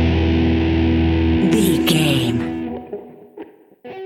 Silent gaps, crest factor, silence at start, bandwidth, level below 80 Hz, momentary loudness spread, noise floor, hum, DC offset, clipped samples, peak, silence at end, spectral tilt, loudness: none; 14 dB; 0 s; 16 kHz; -28 dBFS; 18 LU; -39 dBFS; none; under 0.1%; under 0.1%; -2 dBFS; 0 s; -6 dB/octave; -17 LUFS